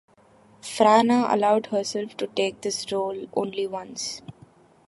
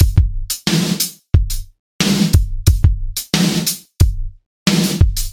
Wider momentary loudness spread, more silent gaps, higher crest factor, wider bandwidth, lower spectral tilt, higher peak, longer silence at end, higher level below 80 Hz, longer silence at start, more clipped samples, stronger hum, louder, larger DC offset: first, 13 LU vs 7 LU; second, none vs 1.79-1.99 s, 4.46-4.66 s; first, 22 dB vs 16 dB; second, 11.5 kHz vs 17 kHz; about the same, -4 dB/octave vs -4.5 dB/octave; second, -4 dBFS vs 0 dBFS; first, 0.55 s vs 0 s; second, -70 dBFS vs -20 dBFS; first, 0.65 s vs 0 s; neither; neither; second, -24 LUFS vs -17 LUFS; neither